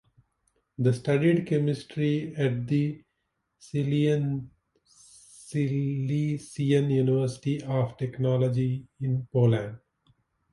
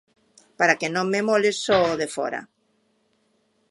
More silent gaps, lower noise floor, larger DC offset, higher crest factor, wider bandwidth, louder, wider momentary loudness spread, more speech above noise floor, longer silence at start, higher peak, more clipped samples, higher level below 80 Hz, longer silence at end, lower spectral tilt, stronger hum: neither; first, -79 dBFS vs -68 dBFS; neither; second, 16 dB vs 22 dB; about the same, 11.5 kHz vs 11.5 kHz; second, -27 LUFS vs -22 LUFS; about the same, 9 LU vs 9 LU; first, 53 dB vs 46 dB; first, 0.8 s vs 0.6 s; second, -10 dBFS vs -2 dBFS; neither; about the same, -62 dBFS vs -60 dBFS; second, 0.75 s vs 1.25 s; first, -8 dB/octave vs -3.5 dB/octave; neither